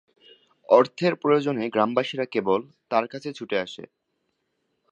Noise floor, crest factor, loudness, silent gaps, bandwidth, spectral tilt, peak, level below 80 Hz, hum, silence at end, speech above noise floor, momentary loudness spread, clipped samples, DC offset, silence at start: -76 dBFS; 22 dB; -24 LUFS; none; 8.8 kHz; -6.5 dB/octave; -4 dBFS; -72 dBFS; none; 1.05 s; 52 dB; 12 LU; under 0.1%; under 0.1%; 0.7 s